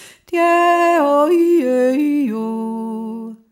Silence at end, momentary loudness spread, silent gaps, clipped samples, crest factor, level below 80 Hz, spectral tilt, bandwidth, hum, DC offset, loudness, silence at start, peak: 0.15 s; 12 LU; none; under 0.1%; 12 dB; -72 dBFS; -5.5 dB/octave; 15.5 kHz; none; under 0.1%; -16 LUFS; 0 s; -4 dBFS